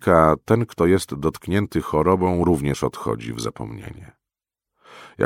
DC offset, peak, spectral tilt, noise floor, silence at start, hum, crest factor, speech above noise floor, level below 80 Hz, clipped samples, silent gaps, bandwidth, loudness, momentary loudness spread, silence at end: under 0.1%; 0 dBFS; -7 dB/octave; -88 dBFS; 0 s; none; 22 dB; 67 dB; -42 dBFS; under 0.1%; none; 16.5 kHz; -21 LUFS; 13 LU; 0 s